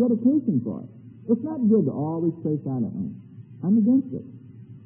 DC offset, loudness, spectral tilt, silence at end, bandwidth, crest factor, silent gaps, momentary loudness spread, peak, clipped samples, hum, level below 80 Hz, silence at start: under 0.1%; -24 LUFS; -15.5 dB/octave; 0 s; 1.7 kHz; 14 dB; none; 17 LU; -10 dBFS; under 0.1%; none; -70 dBFS; 0 s